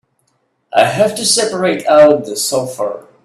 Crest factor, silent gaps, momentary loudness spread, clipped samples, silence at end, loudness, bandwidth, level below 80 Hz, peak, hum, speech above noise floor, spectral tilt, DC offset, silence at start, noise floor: 14 dB; none; 11 LU; under 0.1%; 0.25 s; -13 LUFS; 14.5 kHz; -58 dBFS; 0 dBFS; none; 50 dB; -3 dB/octave; under 0.1%; 0.75 s; -63 dBFS